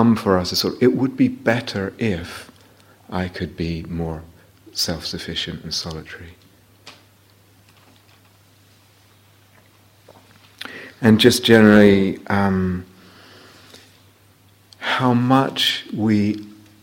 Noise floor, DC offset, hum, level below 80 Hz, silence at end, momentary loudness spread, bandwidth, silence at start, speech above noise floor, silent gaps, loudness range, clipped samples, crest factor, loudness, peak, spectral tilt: -53 dBFS; under 0.1%; none; -48 dBFS; 0.3 s; 19 LU; 16.5 kHz; 0 s; 35 dB; none; 12 LU; under 0.1%; 20 dB; -19 LUFS; 0 dBFS; -5.5 dB/octave